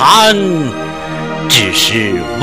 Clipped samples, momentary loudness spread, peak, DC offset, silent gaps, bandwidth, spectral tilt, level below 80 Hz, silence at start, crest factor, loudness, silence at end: 0.5%; 14 LU; 0 dBFS; under 0.1%; none; over 20 kHz; -3 dB/octave; -42 dBFS; 0 s; 12 dB; -11 LUFS; 0 s